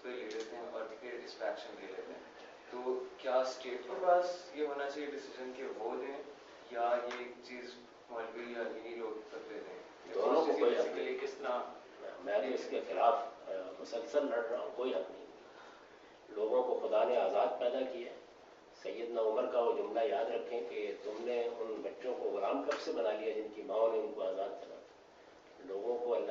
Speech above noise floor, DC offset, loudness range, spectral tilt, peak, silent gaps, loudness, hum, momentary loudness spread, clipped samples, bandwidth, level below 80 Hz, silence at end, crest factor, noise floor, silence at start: 23 dB; under 0.1%; 6 LU; -1.5 dB/octave; -16 dBFS; none; -37 LUFS; none; 17 LU; under 0.1%; 7.6 kHz; -84 dBFS; 0 s; 22 dB; -59 dBFS; 0 s